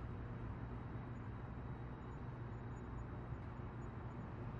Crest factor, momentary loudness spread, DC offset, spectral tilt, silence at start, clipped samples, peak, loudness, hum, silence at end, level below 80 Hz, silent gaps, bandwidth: 12 dB; 1 LU; under 0.1%; -8 dB/octave; 0 s; under 0.1%; -36 dBFS; -50 LUFS; none; 0 s; -54 dBFS; none; 7.4 kHz